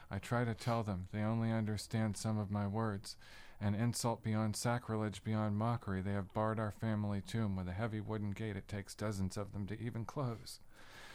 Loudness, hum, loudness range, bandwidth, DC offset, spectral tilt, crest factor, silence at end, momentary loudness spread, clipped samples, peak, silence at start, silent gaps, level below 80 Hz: -39 LUFS; none; 4 LU; 15 kHz; under 0.1%; -6 dB/octave; 14 dB; 0 s; 8 LU; under 0.1%; -24 dBFS; 0 s; none; -62 dBFS